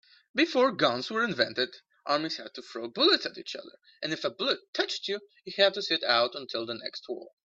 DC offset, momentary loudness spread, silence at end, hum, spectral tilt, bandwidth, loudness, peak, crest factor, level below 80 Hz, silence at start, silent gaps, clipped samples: under 0.1%; 15 LU; 0.3 s; none; -3.5 dB/octave; 7.8 kHz; -28 LUFS; -8 dBFS; 22 dB; -76 dBFS; 0.35 s; 4.68-4.73 s; under 0.1%